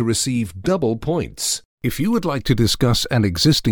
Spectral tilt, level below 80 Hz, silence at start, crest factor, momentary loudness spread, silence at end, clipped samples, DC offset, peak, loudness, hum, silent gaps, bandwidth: -4.5 dB/octave; -38 dBFS; 0 s; 16 dB; 6 LU; 0 s; under 0.1%; under 0.1%; -2 dBFS; -19 LUFS; none; 1.65-1.78 s; over 20 kHz